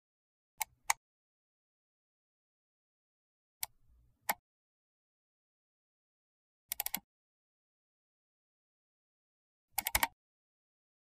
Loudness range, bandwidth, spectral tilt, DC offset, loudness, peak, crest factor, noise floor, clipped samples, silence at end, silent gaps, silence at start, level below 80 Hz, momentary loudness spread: 6 LU; 15.5 kHz; 0 dB/octave; under 0.1%; -38 LUFS; -10 dBFS; 36 dB; -68 dBFS; under 0.1%; 1 s; 0.97-3.60 s, 4.39-6.69 s, 7.04-9.68 s; 0.6 s; -66 dBFS; 10 LU